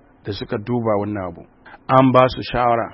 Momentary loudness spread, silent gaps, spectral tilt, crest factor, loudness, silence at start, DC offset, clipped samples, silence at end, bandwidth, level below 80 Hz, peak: 17 LU; none; -9.5 dB/octave; 18 dB; -18 LUFS; 0.25 s; under 0.1%; under 0.1%; 0 s; 5.8 kHz; -44 dBFS; 0 dBFS